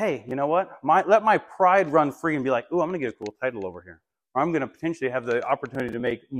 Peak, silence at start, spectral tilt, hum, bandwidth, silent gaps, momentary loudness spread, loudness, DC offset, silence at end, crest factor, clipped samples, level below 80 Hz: -6 dBFS; 0 s; -6.5 dB/octave; none; 12.5 kHz; none; 11 LU; -24 LUFS; under 0.1%; 0 s; 18 dB; under 0.1%; -66 dBFS